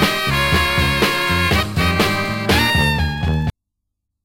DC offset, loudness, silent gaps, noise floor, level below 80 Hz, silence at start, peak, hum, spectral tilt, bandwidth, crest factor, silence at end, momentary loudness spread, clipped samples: under 0.1%; -16 LUFS; none; -77 dBFS; -28 dBFS; 0 s; -2 dBFS; none; -4.5 dB/octave; 16 kHz; 16 dB; 0.75 s; 5 LU; under 0.1%